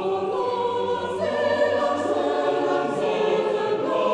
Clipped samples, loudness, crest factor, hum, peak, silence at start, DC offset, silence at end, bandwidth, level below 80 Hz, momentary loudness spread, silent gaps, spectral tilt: under 0.1%; -23 LUFS; 12 dB; none; -10 dBFS; 0 s; under 0.1%; 0 s; 10.5 kHz; -64 dBFS; 4 LU; none; -5 dB/octave